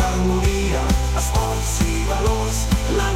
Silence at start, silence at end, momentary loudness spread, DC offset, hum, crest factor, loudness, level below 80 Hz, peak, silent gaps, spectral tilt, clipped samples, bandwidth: 0 s; 0 s; 2 LU; under 0.1%; none; 12 dB; -20 LUFS; -22 dBFS; -6 dBFS; none; -5 dB/octave; under 0.1%; 16.5 kHz